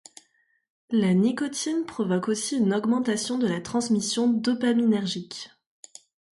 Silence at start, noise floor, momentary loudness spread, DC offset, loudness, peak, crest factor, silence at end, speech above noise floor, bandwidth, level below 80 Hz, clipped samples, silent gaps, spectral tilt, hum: 0.9 s; -68 dBFS; 7 LU; under 0.1%; -25 LUFS; -12 dBFS; 14 dB; 0.9 s; 44 dB; 11.5 kHz; -68 dBFS; under 0.1%; none; -5 dB/octave; none